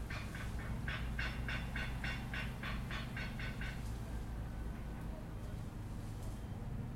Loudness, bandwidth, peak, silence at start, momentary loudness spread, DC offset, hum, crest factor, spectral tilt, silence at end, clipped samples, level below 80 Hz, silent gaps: -44 LUFS; 16.5 kHz; -26 dBFS; 0 s; 6 LU; under 0.1%; none; 16 dB; -5.5 dB/octave; 0 s; under 0.1%; -46 dBFS; none